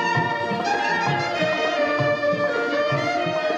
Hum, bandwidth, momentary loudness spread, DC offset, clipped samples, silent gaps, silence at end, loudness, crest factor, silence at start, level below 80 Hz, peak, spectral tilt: none; 8.8 kHz; 2 LU; under 0.1%; under 0.1%; none; 0 s; -22 LUFS; 14 dB; 0 s; -62 dBFS; -8 dBFS; -5 dB/octave